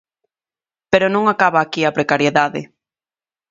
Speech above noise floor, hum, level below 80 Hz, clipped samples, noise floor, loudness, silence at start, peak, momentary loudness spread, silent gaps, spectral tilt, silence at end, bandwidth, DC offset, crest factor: over 74 dB; none; -58 dBFS; under 0.1%; under -90 dBFS; -16 LUFS; 0.9 s; 0 dBFS; 4 LU; none; -5 dB/octave; 0.85 s; 7.8 kHz; under 0.1%; 18 dB